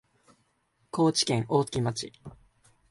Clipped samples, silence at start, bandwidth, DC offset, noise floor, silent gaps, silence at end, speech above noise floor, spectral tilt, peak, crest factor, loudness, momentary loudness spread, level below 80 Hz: under 0.1%; 0.95 s; 11.5 kHz; under 0.1%; -72 dBFS; none; 0.55 s; 45 dB; -5 dB/octave; -10 dBFS; 20 dB; -27 LUFS; 13 LU; -60 dBFS